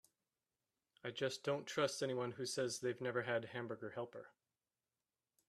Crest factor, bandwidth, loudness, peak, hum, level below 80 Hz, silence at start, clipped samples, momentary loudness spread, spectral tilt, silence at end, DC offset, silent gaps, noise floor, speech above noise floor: 20 dB; 14 kHz; -42 LUFS; -24 dBFS; none; -86 dBFS; 1.05 s; under 0.1%; 10 LU; -4 dB/octave; 1.2 s; under 0.1%; none; under -90 dBFS; over 48 dB